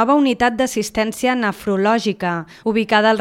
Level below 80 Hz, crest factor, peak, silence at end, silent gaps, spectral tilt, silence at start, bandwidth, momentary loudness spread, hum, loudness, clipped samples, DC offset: -50 dBFS; 16 dB; 0 dBFS; 0 s; none; -4.5 dB/octave; 0 s; 16.5 kHz; 7 LU; none; -18 LUFS; under 0.1%; under 0.1%